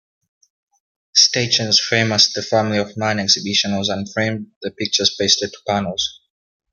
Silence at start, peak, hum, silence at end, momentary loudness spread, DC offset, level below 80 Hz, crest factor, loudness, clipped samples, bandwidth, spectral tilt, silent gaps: 1.15 s; 0 dBFS; none; 0.6 s; 10 LU; under 0.1%; -60 dBFS; 20 dB; -17 LUFS; under 0.1%; 11.5 kHz; -2.5 dB/octave; 4.56-4.61 s